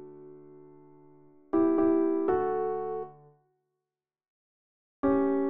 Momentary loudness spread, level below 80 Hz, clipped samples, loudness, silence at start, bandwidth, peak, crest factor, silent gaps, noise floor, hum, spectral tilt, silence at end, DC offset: 22 LU; -64 dBFS; under 0.1%; -28 LUFS; 0 s; 3.6 kHz; -14 dBFS; 16 dB; 4.28-5.03 s; -89 dBFS; none; -8 dB/octave; 0 s; under 0.1%